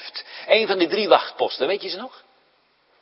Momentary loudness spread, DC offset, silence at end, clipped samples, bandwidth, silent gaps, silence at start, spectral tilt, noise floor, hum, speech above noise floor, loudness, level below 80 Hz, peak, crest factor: 16 LU; under 0.1%; 0.95 s; under 0.1%; 5.8 kHz; none; 0 s; -7.5 dB/octave; -62 dBFS; none; 41 dB; -20 LUFS; -78 dBFS; 0 dBFS; 22 dB